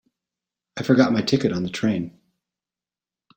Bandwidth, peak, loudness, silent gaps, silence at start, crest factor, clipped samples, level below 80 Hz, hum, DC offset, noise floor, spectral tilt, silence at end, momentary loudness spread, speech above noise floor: 16.5 kHz; -4 dBFS; -21 LUFS; none; 0.75 s; 22 dB; under 0.1%; -58 dBFS; none; under 0.1%; under -90 dBFS; -6 dB/octave; 1.3 s; 15 LU; over 70 dB